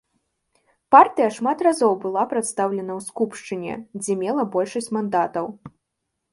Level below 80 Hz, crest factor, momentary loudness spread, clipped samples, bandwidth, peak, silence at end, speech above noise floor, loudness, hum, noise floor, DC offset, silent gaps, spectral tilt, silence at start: -68 dBFS; 22 dB; 15 LU; under 0.1%; 11.5 kHz; 0 dBFS; 0.65 s; 58 dB; -21 LUFS; none; -79 dBFS; under 0.1%; none; -5 dB/octave; 0.9 s